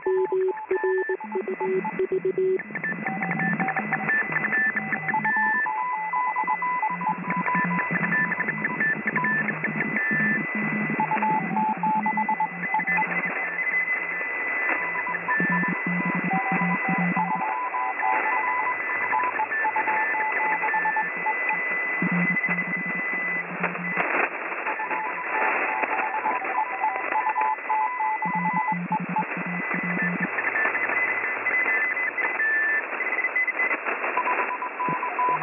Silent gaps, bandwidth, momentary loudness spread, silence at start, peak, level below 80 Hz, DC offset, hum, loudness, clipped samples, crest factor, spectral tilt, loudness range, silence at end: none; 3.7 kHz; 5 LU; 0 s; -10 dBFS; -76 dBFS; under 0.1%; none; -24 LUFS; under 0.1%; 16 dB; -5 dB/octave; 2 LU; 0 s